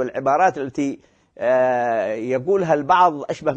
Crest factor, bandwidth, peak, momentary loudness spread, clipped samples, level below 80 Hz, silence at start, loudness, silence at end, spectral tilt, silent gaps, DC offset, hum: 16 dB; 8.4 kHz; -4 dBFS; 10 LU; under 0.1%; -60 dBFS; 0 s; -19 LUFS; 0 s; -6 dB/octave; none; under 0.1%; none